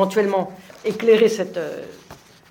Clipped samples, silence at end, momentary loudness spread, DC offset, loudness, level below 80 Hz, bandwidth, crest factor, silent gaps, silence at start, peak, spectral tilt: under 0.1%; 0.35 s; 17 LU; under 0.1%; -20 LUFS; -64 dBFS; 16.5 kHz; 16 dB; none; 0 s; -4 dBFS; -5 dB/octave